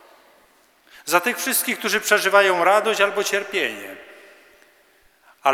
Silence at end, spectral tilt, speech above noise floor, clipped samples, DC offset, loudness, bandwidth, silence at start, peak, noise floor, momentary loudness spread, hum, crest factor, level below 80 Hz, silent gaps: 0 s; -1.5 dB/octave; 37 dB; under 0.1%; under 0.1%; -19 LUFS; over 20 kHz; 1.05 s; -2 dBFS; -57 dBFS; 16 LU; none; 20 dB; -74 dBFS; none